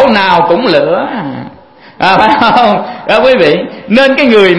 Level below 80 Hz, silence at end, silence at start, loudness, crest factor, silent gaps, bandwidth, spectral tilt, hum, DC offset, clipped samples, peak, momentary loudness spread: -42 dBFS; 0 s; 0 s; -8 LUFS; 8 dB; none; 11 kHz; -6 dB/octave; none; under 0.1%; 1%; 0 dBFS; 9 LU